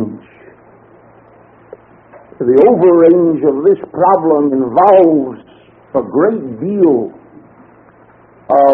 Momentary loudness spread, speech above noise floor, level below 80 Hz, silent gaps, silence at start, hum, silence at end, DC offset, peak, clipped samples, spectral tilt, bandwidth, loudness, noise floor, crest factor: 12 LU; 34 dB; -56 dBFS; none; 0 s; none; 0 s; under 0.1%; 0 dBFS; under 0.1%; -11 dB/octave; 3.8 kHz; -11 LUFS; -44 dBFS; 12 dB